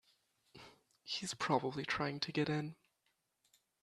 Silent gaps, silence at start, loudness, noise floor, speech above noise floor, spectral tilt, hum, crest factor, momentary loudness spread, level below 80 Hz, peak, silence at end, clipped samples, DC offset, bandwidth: none; 0.55 s; -39 LUFS; -83 dBFS; 44 dB; -4.5 dB/octave; none; 24 dB; 22 LU; -74 dBFS; -18 dBFS; 1.1 s; under 0.1%; under 0.1%; 13 kHz